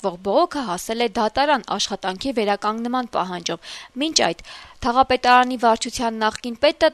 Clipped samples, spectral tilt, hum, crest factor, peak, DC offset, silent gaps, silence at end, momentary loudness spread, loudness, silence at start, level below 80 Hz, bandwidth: under 0.1%; -3 dB/octave; none; 20 dB; -2 dBFS; under 0.1%; none; 0 s; 10 LU; -21 LUFS; 0 s; -48 dBFS; 13.5 kHz